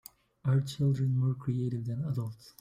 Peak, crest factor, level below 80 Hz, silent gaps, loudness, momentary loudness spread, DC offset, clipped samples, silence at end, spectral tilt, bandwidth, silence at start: -18 dBFS; 14 dB; -62 dBFS; none; -32 LUFS; 8 LU; under 0.1%; under 0.1%; 0.1 s; -8 dB/octave; 16 kHz; 0.45 s